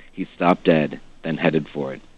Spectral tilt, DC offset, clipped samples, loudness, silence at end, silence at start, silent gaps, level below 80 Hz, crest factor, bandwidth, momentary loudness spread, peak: -8 dB/octave; under 0.1%; under 0.1%; -21 LUFS; 0.15 s; 0.15 s; none; -50 dBFS; 20 dB; 8.2 kHz; 13 LU; -2 dBFS